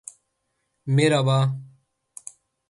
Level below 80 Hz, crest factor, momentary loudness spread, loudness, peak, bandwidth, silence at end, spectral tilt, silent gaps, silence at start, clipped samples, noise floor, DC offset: -64 dBFS; 18 dB; 23 LU; -21 LUFS; -6 dBFS; 11.5 kHz; 1.05 s; -6 dB/octave; none; 0.85 s; under 0.1%; -75 dBFS; under 0.1%